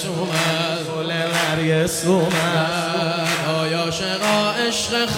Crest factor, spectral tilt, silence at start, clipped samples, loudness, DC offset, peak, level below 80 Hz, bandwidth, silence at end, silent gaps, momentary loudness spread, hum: 14 dB; -4 dB/octave; 0 s; under 0.1%; -20 LUFS; under 0.1%; -6 dBFS; -52 dBFS; 16.5 kHz; 0 s; none; 4 LU; none